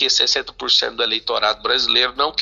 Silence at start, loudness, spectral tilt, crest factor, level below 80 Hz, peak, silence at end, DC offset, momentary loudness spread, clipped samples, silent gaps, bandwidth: 0 s; -17 LUFS; 0.5 dB/octave; 16 dB; -50 dBFS; -2 dBFS; 0 s; under 0.1%; 5 LU; under 0.1%; none; 7.6 kHz